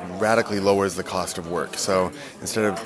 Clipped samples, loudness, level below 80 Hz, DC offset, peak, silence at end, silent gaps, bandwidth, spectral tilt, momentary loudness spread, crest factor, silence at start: under 0.1%; -23 LUFS; -56 dBFS; under 0.1%; -4 dBFS; 0 s; none; 11 kHz; -4 dB/octave; 7 LU; 18 dB; 0 s